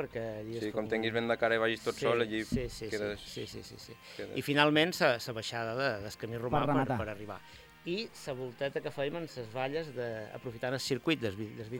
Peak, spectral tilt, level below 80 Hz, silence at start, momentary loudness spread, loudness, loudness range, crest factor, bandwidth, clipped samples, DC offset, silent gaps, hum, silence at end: -10 dBFS; -5 dB/octave; -58 dBFS; 0 s; 14 LU; -33 LUFS; 7 LU; 24 dB; 17 kHz; under 0.1%; under 0.1%; none; none; 0 s